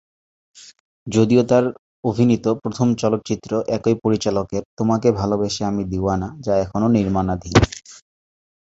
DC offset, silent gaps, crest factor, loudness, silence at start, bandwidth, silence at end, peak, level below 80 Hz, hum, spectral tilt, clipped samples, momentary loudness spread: under 0.1%; 0.80-1.06 s, 1.79-2.03 s, 4.65-4.77 s; 20 dB; -20 LUFS; 0.55 s; 8 kHz; 0.65 s; 0 dBFS; -40 dBFS; none; -6.5 dB/octave; under 0.1%; 7 LU